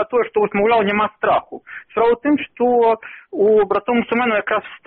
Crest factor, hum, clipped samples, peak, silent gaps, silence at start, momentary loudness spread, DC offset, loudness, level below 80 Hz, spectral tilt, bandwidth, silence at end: 12 dB; none; under 0.1%; -6 dBFS; none; 0 s; 8 LU; under 0.1%; -17 LUFS; -54 dBFS; -3.5 dB/octave; 4.3 kHz; 0.1 s